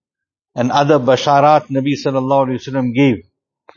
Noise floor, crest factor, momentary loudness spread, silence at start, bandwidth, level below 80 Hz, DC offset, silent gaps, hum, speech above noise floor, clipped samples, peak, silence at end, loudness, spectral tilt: -85 dBFS; 16 dB; 8 LU; 0.55 s; 7.4 kHz; -56 dBFS; under 0.1%; none; none; 72 dB; under 0.1%; 0 dBFS; 0.55 s; -15 LUFS; -6.5 dB/octave